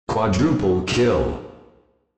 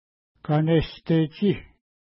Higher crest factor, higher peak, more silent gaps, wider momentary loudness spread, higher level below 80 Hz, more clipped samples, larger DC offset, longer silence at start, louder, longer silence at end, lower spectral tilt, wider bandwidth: about the same, 14 dB vs 14 dB; about the same, -8 dBFS vs -10 dBFS; neither; about the same, 7 LU vs 9 LU; first, -38 dBFS vs -46 dBFS; neither; neither; second, 0.1 s vs 0.45 s; first, -20 LUFS vs -24 LUFS; about the same, 0.6 s vs 0.5 s; second, -6 dB/octave vs -12 dB/octave; first, 8.6 kHz vs 5.8 kHz